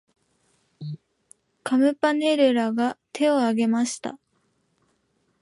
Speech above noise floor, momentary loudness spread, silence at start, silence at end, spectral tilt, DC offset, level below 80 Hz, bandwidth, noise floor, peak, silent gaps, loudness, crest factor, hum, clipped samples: 48 dB; 18 LU; 0.8 s; 1.25 s; -4.5 dB/octave; under 0.1%; -76 dBFS; 11.5 kHz; -69 dBFS; -8 dBFS; none; -22 LUFS; 16 dB; none; under 0.1%